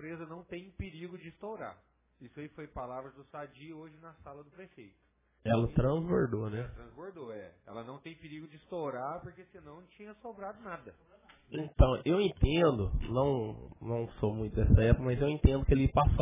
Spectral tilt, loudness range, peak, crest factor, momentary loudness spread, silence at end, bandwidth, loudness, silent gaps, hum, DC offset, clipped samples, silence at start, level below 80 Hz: -7 dB/octave; 16 LU; -8 dBFS; 26 dB; 23 LU; 0 s; 3.8 kHz; -31 LUFS; none; none; under 0.1%; under 0.1%; 0 s; -38 dBFS